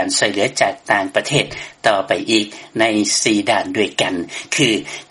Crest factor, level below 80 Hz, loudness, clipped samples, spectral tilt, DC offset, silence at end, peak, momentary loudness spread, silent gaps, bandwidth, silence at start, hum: 18 dB; -56 dBFS; -17 LUFS; under 0.1%; -3 dB/octave; under 0.1%; 0.05 s; 0 dBFS; 5 LU; none; 11.5 kHz; 0 s; none